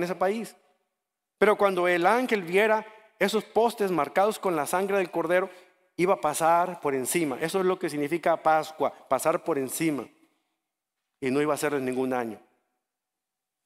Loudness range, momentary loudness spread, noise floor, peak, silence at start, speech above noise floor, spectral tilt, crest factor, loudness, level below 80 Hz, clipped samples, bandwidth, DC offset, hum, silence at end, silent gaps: 5 LU; 7 LU; -87 dBFS; -6 dBFS; 0 s; 61 dB; -4.5 dB/octave; 20 dB; -26 LUFS; -70 dBFS; under 0.1%; 16 kHz; under 0.1%; none; 1.3 s; none